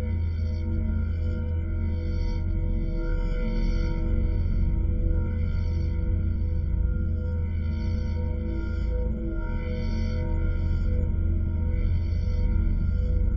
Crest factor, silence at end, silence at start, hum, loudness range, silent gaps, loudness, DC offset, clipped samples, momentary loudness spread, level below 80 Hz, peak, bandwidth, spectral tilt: 12 dB; 0 s; 0 s; none; 2 LU; none; -28 LUFS; under 0.1%; under 0.1%; 3 LU; -28 dBFS; -14 dBFS; 6 kHz; -9.5 dB/octave